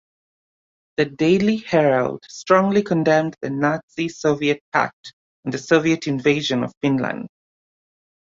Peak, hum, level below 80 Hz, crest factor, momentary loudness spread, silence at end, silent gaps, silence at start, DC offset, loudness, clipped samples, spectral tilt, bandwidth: -2 dBFS; none; -60 dBFS; 20 dB; 11 LU; 1.05 s; 3.83-3.88 s, 4.61-4.72 s, 4.93-5.04 s, 5.13-5.43 s, 6.77-6.81 s; 1 s; under 0.1%; -20 LUFS; under 0.1%; -6 dB/octave; 7.8 kHz